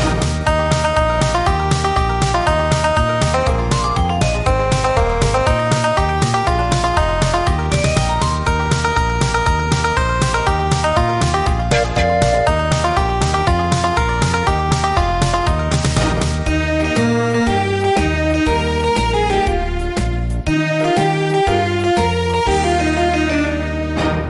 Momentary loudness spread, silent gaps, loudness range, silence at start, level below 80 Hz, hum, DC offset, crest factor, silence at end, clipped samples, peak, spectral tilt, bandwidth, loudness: 2 LU; none; 1 LU; 0 s; -24 dBFS; none; 0.3%; 12 dB; 0 s; under 0.1%; -2 dBFS; -5 dB/octave; 11.5 kHz; -16 LUFS